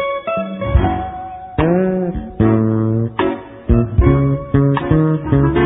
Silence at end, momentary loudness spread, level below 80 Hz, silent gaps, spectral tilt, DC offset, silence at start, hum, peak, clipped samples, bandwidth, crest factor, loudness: 0 s; 9 LU; -24 dBFS; none; -13.5 dB/octave; under 0.1%; 0 s; none; 0 dBFS; under 0.1%; 3.9 kHz; 16 dB; -16 LUFS